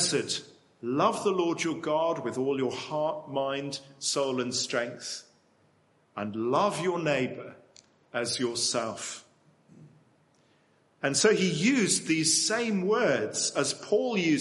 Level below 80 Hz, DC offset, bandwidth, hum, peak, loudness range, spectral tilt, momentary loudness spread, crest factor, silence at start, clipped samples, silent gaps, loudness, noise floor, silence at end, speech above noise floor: -74 dBFS; under 0.1%; 11.5 kHz; none; -8 dBFS; 7 LU; -3 dB/octave; 13 LU; 20 dB; 0 s; under 0.1%; none; -28 LUFS; -66 dBFS; 0 s; 38 dB